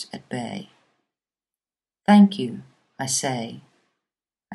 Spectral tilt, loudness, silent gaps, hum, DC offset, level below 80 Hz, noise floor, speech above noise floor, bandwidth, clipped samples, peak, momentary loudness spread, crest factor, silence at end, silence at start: -5 dB/octave; -21 LUFS; none; none; under 0.1%; -72 dBFS; under -90 dBFS; over 69 dB; 12.5 kHz; under 0.1%; -4 dBFS; 21 LU; 22 dB; 0 s; 0 s